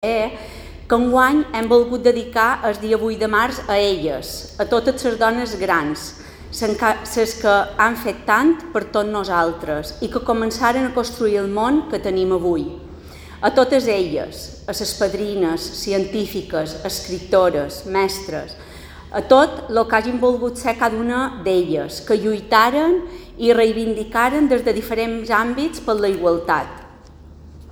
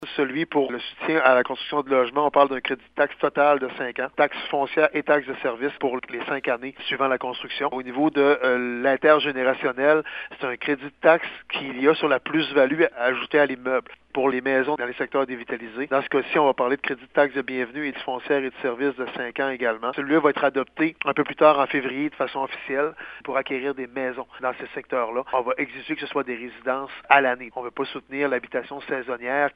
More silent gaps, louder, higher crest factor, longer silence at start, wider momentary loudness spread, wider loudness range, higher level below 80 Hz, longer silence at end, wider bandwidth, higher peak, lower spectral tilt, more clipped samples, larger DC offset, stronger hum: neither; first, -19 LUFS vs -23 LUFS; about the same, 18 dB vs 22 dB; about the same, 0 s vs 0 s; about the same, 12 LU vs 10 LU; about the same, 3 LU vs 4 LU; first, -42 dBFS vs -66 dBFS; about the same, 0 s vs 0.05 s; first, over 20 kHz vs 5.2 kHz; about the same, 0 dBFS vs 0 dBFS; second, -4.5 dB/octave vs -7.5 dB/octave; neither; neither; neither